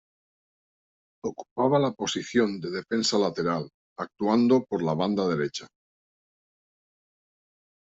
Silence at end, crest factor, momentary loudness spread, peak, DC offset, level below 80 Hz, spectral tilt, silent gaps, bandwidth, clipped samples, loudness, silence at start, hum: 2.35 s; 20 dB; 13 LU; -8 dBFS; under 0.1%; -68 dBFS; -5 dB/octave; 1.51-1.56 s, 3.74-3.96 s; 8 kHz; under 0.1%; -26 LUFS; 1.25 s; none